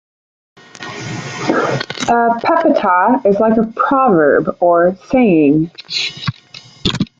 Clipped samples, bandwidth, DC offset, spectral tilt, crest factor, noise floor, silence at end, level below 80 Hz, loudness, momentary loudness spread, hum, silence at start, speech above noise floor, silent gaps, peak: under 0.1%; 8 kHz; under 0.1%; -5.5 dB/octave; 12 dB; -39 dBFS; 0.15 s; -48 dBFS; -14 LUFS; 13 LU; none; 0.8 s; 26 dB; none; -2 dBFS